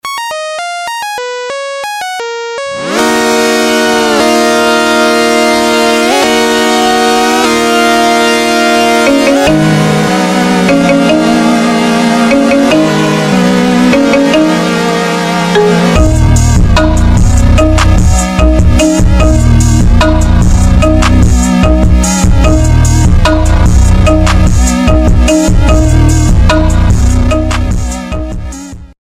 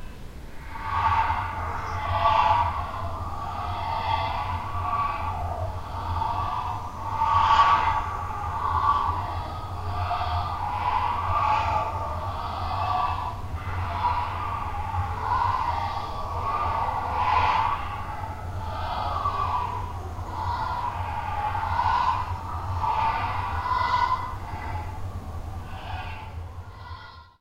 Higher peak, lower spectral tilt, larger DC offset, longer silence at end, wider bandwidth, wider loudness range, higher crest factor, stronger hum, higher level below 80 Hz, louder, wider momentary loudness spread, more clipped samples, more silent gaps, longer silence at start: first, 0 dBFS vs -6 dBFS; about the same, -5 dB/octave vs -5.5 dB/octave; neither; about the same, 0.15 s vs 0.1 s; about the same, 15.5 kHz vs 16 kHz; second, 2 LU vs 5 LU; second, 8 dB vs 20 dB; neither; first, -12 dBFS vs -38 dBFS; first, -8 LUFS vs -27 LUFS; second, 9 LU vs 12 LU; first, 0.3% vs under 0.1%; neither; about the same, 0.05 s vs 0 s